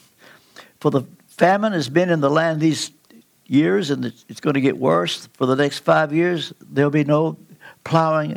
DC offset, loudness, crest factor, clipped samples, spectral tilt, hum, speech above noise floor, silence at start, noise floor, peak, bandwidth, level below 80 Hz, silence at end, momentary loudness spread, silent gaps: under 0.1%; -19 LUFS; 18 dB; under 0.1%; -6 dB/octave; none; 33 dB; 0.6 s; -52 dBFS; -2 dBFS; 16 kHz; -68 dBFS; 0 s; 9 LU; none